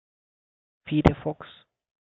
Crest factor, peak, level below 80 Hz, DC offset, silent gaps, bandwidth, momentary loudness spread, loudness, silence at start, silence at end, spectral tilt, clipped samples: 26 dB; -2 dBFS; -40 dBFS; under 0.1%; none; 7.6 kHz; 24 LU; -25 LUFS; 0.85 s; 0.7 s; -9 dB/octave; under 0.1%